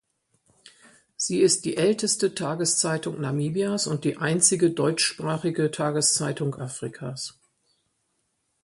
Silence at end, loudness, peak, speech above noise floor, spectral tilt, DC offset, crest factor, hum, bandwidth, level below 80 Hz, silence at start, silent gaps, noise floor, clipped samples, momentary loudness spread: 1.3 s; -24 LUFS; -6 dBFS; 49 dB; -3.5 dB/octave; under 0.1%; 20 dB; none; 11.5 kHz; -66 dBFS; 0.65 s; none; -74 dBFS; under 0.1%; 13 LU